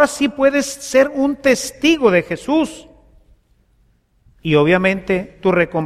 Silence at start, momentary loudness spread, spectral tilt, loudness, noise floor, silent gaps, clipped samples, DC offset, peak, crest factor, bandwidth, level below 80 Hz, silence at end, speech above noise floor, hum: 0 s; 6 LU; -5 dB/octave; -16 LUFS; -58 dBFS; none; under 0.1%; under 0.1%; 0 dBFS; 16 dB; 15 kHz; -48 dBFS; 0 s; 42 dB; none